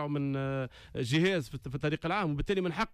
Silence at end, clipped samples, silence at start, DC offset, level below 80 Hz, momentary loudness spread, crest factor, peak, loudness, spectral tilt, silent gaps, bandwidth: 0 s; under 0.1%; 0 s; under 0.1%; -50 dBFS; 9 LU; 14 dB; -18 dBFS; -32 LUFS; -6.5 dB/octave; none; 13.5 kHz